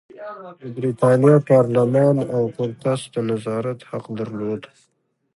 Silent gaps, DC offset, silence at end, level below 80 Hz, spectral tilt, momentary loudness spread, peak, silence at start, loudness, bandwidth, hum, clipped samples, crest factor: none; under 0.1%; 0.7 s; -62 dBFS; -8 dB/octave; 18 LU; -2 dBFS; 0.15 s; -19 LUFS; 11.5 kHz; none; under 0.1%; 18 dB